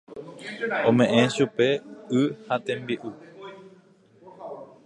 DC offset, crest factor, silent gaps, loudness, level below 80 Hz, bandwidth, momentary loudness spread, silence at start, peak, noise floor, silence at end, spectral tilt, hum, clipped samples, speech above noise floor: under 0.1%; 22 dB; none; -24 LUFS; -70 dBFS; 11 kHz; 23 LU; 0.1 s; -4 dBFS; -56 dBFS; 0.2 s; -5.5 dB/octave; none; under 0.1%; 32 dB